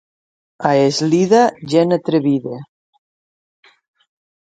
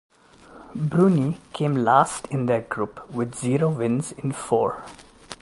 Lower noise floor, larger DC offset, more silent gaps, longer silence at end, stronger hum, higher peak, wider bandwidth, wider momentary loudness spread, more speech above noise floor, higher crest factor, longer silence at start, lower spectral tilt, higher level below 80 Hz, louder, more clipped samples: first, under -90 dBFS vs -49 dBFS; neither; neither; first, 1.95 s vs 0.05 s; neither; first, 0 dBFS vs -4 dBFS; second, 9.2 kHz vs 11.5 kHz; about the same, 9 LU vs 11 LU; first, over 75 dB vs 26 dB; about the same, 18 dB vs 20 dB; about the same, 0.6 s vs 0.5 s; about the same, -6 dB/octave vs -6.5 dB/octave; second, -64 dBFS vs -58 dBFS; first, -15 LUFS vs -23 LUFS; neither